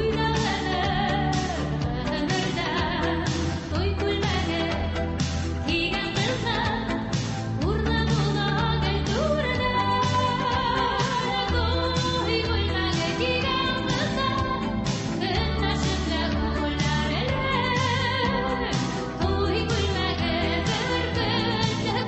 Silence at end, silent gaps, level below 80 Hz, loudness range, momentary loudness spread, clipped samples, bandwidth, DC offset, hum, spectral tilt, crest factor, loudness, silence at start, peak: 0 s; none; -34 dBFS; 2 LU; 4 LU; under 0.1%; 8.4 kHz; under 0.1%; none; -5 dB/octave; 14 dB; -25 LUFS; 0 s; -10 dBFS